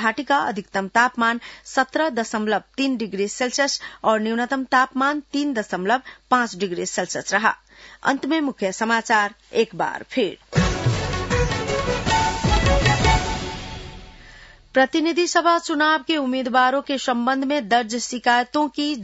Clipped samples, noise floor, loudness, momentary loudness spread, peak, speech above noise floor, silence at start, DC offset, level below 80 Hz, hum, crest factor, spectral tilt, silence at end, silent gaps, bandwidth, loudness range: under 0.1%; -46 dBFS; -21 LUFS; 6 LU; -4 dBFS; 24 dB; 0 s; under 0.1%; -36 dBFS; none; 18 dB; -4.5 dB/octave; 0 s; none; 8 kHz; 3 LU